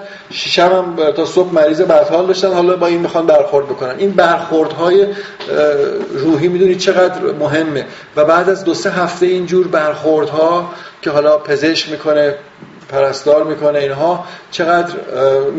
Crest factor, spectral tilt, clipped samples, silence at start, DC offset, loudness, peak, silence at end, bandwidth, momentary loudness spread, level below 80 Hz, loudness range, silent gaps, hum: 12 dB; -3.5 dB/octave; under 0.1%; 0 s; under 0.1%; -13 LUFS; 0 dBFS; 0 s; 8 kHz; 8 LU; -56 dBFS; 3 LU; none; none